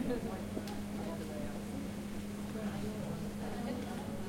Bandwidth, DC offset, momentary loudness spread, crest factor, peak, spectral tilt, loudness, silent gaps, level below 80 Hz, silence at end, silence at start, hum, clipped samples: 16.5 kHz; under 0.1%; 2 LU; 16 dB; -24 dBFS; -6 dB/octave; -41 LUFS; none; -54 dBFS; 0 s; 0 s; none; under 0.1%